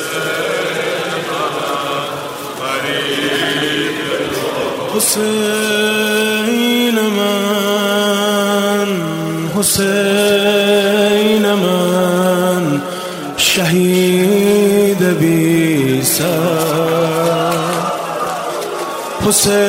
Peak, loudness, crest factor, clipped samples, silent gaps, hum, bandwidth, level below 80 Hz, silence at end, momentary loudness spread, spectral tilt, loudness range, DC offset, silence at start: 0 dBFS; -14 LUFS; 14 dB; under 0.1%; none; none; 16.5 kHz; -50 dBFS; 0 s; 8 LU; -4 dB/octave; 5 LU; under 0.1%; 0 s